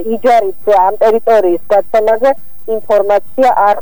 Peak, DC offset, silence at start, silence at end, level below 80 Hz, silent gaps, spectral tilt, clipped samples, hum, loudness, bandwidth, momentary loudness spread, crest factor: 0 dBFS; 8%; 0 s; 0 s; -48 dBFS; none; -5.5 dB/octave; under 0.1%; none; -11 LUFS; over 20 kHz; 5 LU; 10 dB